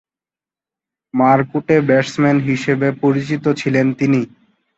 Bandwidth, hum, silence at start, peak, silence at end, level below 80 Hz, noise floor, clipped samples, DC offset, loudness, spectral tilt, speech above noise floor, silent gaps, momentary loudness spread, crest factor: 8 kHz; none; 1.15 s; 0 dBFS; 0.5 s; -56 dBFS; under -90 dBFS; under 0.1%; under 0.1%; -16 LUFS; -7 dB/octave; over 75 dB; none; 5 LU; 16 dB